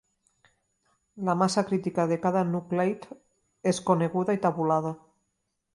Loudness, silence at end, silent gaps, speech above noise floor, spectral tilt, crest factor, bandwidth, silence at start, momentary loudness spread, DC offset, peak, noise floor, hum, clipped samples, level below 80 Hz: -27 LUFS; 0.8 s; none; 53 dB; -6.5 dB/octave; 20 dB; 11.5 kHz; 1.15 s; 9 LU; under 0.1%; -8 dBFS; -79 dBFS; none; under 0.1%; -70 dBFS